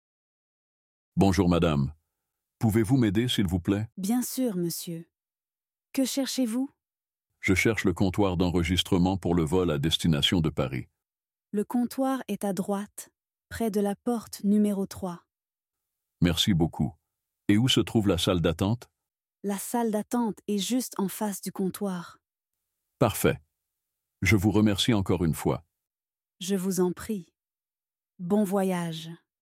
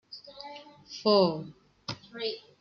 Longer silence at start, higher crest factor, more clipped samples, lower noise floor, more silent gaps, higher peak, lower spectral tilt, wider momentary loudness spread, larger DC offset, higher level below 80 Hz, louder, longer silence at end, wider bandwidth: first, 1.15 s vs 0.1 s; about the same, 20 dB vs 22 dB; neither; first, under -90 dBFS vs -47 dBFS; neither; about the same, -8 dBFS vs -10 dBFS; about the same, -5.5 dB/octave vs -6 dB/octave; second, 12 LU vs 22 LU; neither; first, -52 dBFS vs -72 dBFS; about the same, -27 LUFS vs -29 LUFS; about the same, 0.25 s vs 0.2 s; first, 16.5 kHz vs 7 kHz